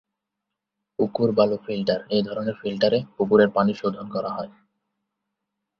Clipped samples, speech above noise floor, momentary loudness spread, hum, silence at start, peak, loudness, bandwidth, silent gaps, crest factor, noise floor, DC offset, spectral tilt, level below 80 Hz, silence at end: under 0.1%; 61 dB; 11 LU; none; 1 s; -4 dBFS; -23 LUFS; 6.4 kHz; none; 20 dB; -84 dBFS; under 0.1%; -7.5 dB/octave; -62 dBFS; 1.3 s